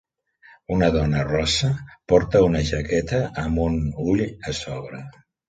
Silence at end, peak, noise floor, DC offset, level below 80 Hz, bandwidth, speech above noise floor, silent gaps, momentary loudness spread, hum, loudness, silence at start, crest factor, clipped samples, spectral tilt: 0.4 s; -4 dBFS; -54 dBFS; under 0.1%; -36 dBFS; 9.2 kHz; 32 dB; none; 12 LU; none; -22 LUFS; 0.7 s; 18 dB; under 0.1%; -6 dB/octave